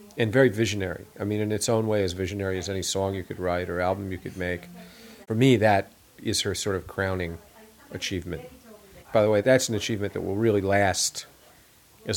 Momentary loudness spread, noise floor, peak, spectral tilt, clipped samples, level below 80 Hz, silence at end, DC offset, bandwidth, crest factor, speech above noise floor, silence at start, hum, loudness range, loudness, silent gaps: 15 LU; -56 dBFS; -6 dBFS; -4.5 dB/octave; under 0.1%; -54 dBFS; 0 s; under 0.1%; 18 kHz; 20 dB; 30 dB; 0 s; none; 5 LU; -26 LUFS; none